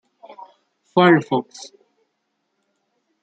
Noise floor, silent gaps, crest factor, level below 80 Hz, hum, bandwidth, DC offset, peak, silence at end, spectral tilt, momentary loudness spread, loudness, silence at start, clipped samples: -73 dBFS; none; 20 dB; -70 dBFS; none; 8.4 kHz; under 0.1%; -2 dBFS; 1.8 s; -6.5 dB/octave; 25 LU; -17 LUFS; 0.95 s; under 0.1%